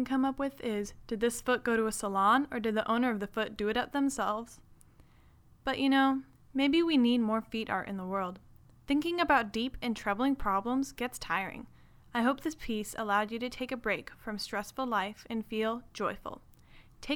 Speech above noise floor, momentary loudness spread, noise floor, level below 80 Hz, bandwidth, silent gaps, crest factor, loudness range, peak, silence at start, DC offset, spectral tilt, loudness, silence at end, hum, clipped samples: 29 dB; 11 LU; -60 dBFS; -56 dBFS; 17.5 kHz; none; 20 dB; 4 LU; -12 dBFS; 0 s; under 0.1%; -4 dB/octave; -32 LUFS; 0 s; none; under 0.1%